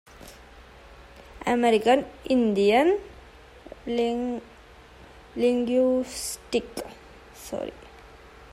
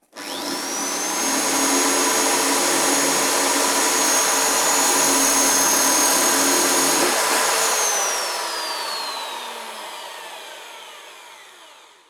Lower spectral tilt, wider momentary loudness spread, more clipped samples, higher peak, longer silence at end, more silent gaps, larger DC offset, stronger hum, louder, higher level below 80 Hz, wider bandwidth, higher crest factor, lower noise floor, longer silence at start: first, -4.5 dB/octave vs 0.5 dB/octave; first, 22 LU vs 17 LU; neither; about the same, -8 dBFS vs -6 dBFS; second, 0.1 s vs 0.35 s; neither; neither; neither; second, -25 LUFS vs -17 LUFS; first, -54 dBFS vs -60 dBFS; second, 15.5 kHz vs 19.5 kHz; about the same, 18 dB vs 16 dB; about the same, -49 dBFS vs -47 dBFS; about the same, 0.2 s vs 0.15 s